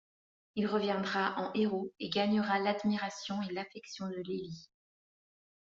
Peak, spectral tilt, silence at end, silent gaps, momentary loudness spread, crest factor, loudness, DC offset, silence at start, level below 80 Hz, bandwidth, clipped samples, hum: -16 dBFS; -4 dB/octave; 1 s; none; 11 LU; 18 dB; -34 LUFS; under 0.1%; 0.55 s; -76 dBFS; 7.6 kHz; under 0.1%; none